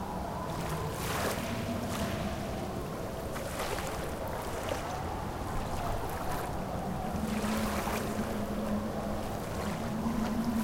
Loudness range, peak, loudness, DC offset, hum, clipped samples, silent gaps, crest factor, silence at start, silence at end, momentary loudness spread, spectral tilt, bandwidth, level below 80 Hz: 2 LU; -20 dBFS; -35 LUFS; under 0.1%; none; under 0.1%; none; 14 dB; 0 s; 0 s; 5 LU; -5.5 dB/octave; 17 kHz; -44 dBFS